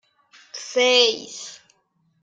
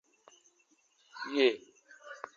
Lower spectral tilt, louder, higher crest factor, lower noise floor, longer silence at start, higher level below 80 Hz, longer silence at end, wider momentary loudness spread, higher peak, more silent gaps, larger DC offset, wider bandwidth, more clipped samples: second, 0.5 dB/octave vs -2.5 dB/octave; first, -18 LUFS vs -31 LUFS; about the same, 22 dB vs 24 dB; second, -67 dBFS vs -71 dBFS; second, 0.55 s vs 1.15 s; first, -78 dBFS vs under -90 dBFS; first, 0.7 s vs 0.1 s; second, 22 LU vs 25 LU; first, -2 dBFS vs -12 dBFS; neither; neither; first, 9.2 kHz vs 7.4 kHz; neither